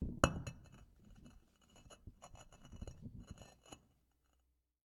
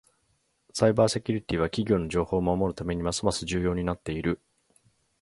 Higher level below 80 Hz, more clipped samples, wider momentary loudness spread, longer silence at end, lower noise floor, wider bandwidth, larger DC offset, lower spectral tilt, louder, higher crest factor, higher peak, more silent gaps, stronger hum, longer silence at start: second, -56 dBFS vs -46 dBFS; neither; first, 27 LU vs 6 LU; first, 1.1 s vs 0.85 s; first, -81 dBFS vs -72 dBFS; first, 17 kHz vs 11.5 kHz; neither; about the same, -5 dB/octave vs -5.5 dB/octave; second, -43 LUFS vs -27 LUFS; first, 36 dB vs 22 dB; second, -12 dBFS vs -6 dBFS; neither; neither; second, 0 s vs 0.75 s